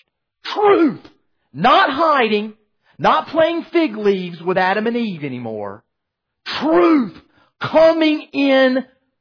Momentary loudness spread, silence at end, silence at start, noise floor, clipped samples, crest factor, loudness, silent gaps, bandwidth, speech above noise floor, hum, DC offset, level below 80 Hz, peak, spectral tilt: 15 LU; 0.35 s; 0.45 s; -77 dBFS; under 0.1%; 14 dB; -16 LUFS; none; 5.4 kHz; 62 dB; none; under 0.1%; -56 dBFS; -4 dBFS; -6.5 dB/octave